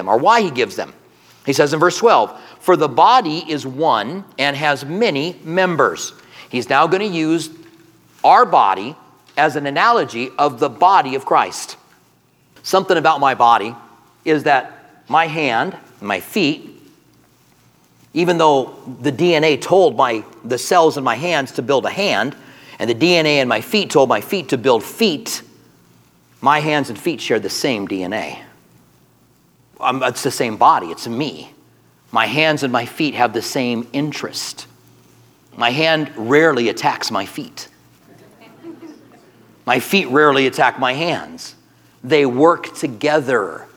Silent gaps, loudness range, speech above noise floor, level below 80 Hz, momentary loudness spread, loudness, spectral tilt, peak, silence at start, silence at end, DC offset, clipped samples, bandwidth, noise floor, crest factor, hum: none; 5 LU; 39 dB; -68 dBFS; 13 LU; -16 LUFS; -4 dB/octave; 0 dBFS; 0 s; 0.1 s; under 0.1%; under 0.1%; over 20 kHz; -55 dBFS; 18 dB; none